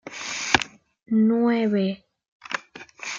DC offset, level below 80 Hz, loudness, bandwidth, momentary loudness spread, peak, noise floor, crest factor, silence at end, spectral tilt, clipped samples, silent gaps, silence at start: under 0.1%; -58 dBFS; -23 LUFS; 7.6 kHz; 15 LU; -2 dBFS; -43 dBFS; 24 dB; 0 s; -4.5 dB/octave; under 0.1%; 2.28-2.40 s; 0.05 s